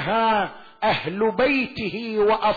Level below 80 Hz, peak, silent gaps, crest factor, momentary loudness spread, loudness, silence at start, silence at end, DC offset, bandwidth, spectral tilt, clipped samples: -52 dBFS; -10 dBFS; none; 10 dB; 7 LU; -22 LUFS; 0 s; 0 s; under 0.1%; 4.9 kHz; -7 dB/octave; under 0.1%